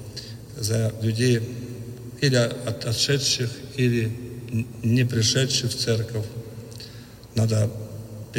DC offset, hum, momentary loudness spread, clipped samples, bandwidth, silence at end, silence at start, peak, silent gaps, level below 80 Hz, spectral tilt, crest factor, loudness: under 0.1%; none; 17 LU; under 0.1%; 16.5 kHz; 0 s; 0 s; -6 dBFS; none; -52 dBFS; -4.5 dB/octave; 18 dB; -24 LUFS